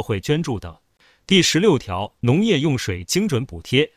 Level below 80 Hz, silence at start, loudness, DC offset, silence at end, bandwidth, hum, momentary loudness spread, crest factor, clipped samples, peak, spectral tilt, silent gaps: -44 dBFS; 0 s; -19 LUFS; under 0.1%; 0.1 s; 16 kHz; none; 11 LU; 18 dB; under 0.1%; -2 dBFS; -4.5 dB/octave; none